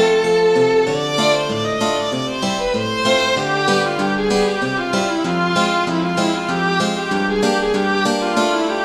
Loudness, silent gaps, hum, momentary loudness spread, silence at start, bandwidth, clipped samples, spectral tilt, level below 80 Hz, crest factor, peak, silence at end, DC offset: -17 LUFS; none; none; 5 LU; 0 s; 13.5 kHz; under 0.1%; -4 dB/octave; -46 dBFS; 14 dB; -2 dBFS; 0 s; under 0.1%